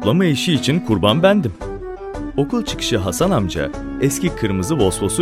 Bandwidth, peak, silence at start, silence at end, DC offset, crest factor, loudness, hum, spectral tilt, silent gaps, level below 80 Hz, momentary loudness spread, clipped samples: 16 kHz; 0 dBFS; 0 s; 0 s; under 0.1%; 18 dB; -18 LUFS; none; -5 dB/octave; none; -36 dBFS; 11 LU; under 0.1%